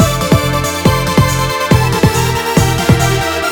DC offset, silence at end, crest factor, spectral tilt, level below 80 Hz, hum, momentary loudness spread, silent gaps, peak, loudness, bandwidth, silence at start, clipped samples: under 0.1%; 0 s; 12 dB; -5 dB/octave; -26 dBFS; none; 3 LU; none; 0 dBFS; -12 LUFS; 19.5 kHz; 0 s; under 0.1%